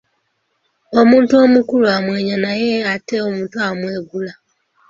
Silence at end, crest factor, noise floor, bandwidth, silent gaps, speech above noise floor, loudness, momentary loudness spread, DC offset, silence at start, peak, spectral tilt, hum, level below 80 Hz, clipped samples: 0.55 s; 14 dB; -67 dBFS; 7.4 kHz; none; 53 dB; -15 LUFS; 14 LU; under 0.1%; 0.9 s; -2 dBFS; -6 dB/octave; none; -58 dBFS; under 0.1%